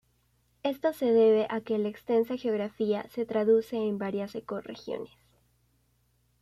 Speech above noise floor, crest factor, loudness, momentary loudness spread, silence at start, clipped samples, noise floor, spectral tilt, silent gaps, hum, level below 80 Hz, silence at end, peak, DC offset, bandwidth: 42 dB; 16 dB; -29 LUFS; 15 LU; 0.65 s; under 0.1%; -70 dBFS; -7 dB/octave; none; 60 Hz at -60 dBFS; -70 dBFS; 1.35 s; -14 dBFS; under 0.1%; 14 kHz